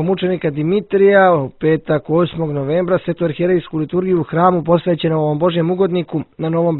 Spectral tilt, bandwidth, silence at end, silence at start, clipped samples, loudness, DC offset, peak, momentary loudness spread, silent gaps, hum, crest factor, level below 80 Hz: -12 dB/octave; 4.2 kHz; 0 s; 0 s; under 0.1%; -16 LUFS; under 0.1%; 0 dBFS; 8 LU; none; none; 16 dB; -50 dBFS